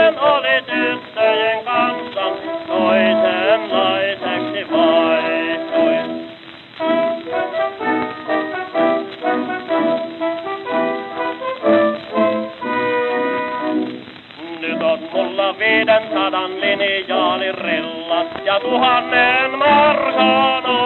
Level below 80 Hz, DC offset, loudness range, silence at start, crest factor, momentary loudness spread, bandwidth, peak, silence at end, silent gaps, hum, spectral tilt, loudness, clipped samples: -60 dBFS; under 0.1%; 5 LU; 0 s; 16 dB; 9 LU; 4.3 kHz; -2 dBFS; 0 s; none; none; -6.5 dB/octave; -17 LUFS; under 0.1%